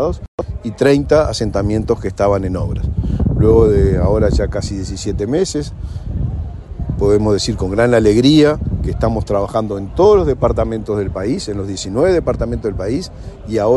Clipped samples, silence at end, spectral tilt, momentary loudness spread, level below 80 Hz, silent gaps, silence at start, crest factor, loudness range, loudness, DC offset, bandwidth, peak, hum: under 0.1%; 0 s; -6.5 dB/octave; 12 LU; -24 dBFS; 0.28-0.38 s; 0 s; 14 dB; 5 LU; -16 LUFS; under 0.1%; 11.5 kHz; 0 dBFS; none